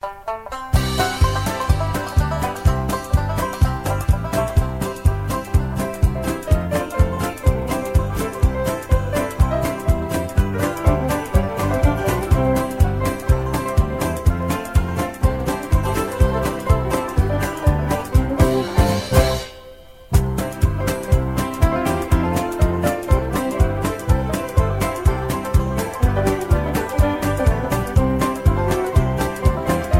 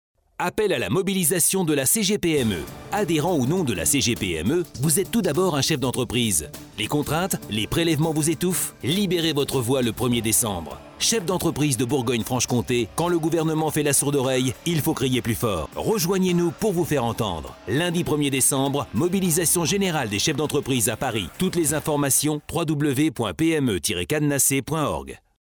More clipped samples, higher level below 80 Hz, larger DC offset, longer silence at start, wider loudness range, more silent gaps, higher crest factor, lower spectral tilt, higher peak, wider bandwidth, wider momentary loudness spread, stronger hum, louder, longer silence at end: neither; first, -24 dBFS vs -48 dBFS; neither; second, 0.05 s vs 0.4 s; about the same, 2 LU vs 2 LU; neither; about the same, 18 dB vs 14 dB; first, -6.5 dB/octave vs -4 dB/octave; first, 0 dBFS vs -10 dBFS; second, 16.5 kHz vs over 20 kHz; about the same, 4 LU vs 6 LU; neither; about the same, -20 LUFS vs -22 LUFS; second, 0 s vs 0.25 s